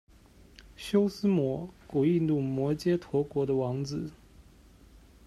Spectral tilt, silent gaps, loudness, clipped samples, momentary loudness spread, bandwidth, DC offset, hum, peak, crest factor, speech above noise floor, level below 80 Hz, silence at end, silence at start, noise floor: -8 dB/octave; none; -29 LUFS; under 0.1%; 10 LU; 13.5 kHz; under 0.1%; none; -14 dBFS; 16 dB; 28 dB; -58 dBFS; 0.85 s; 0.6 s; -56 dBFS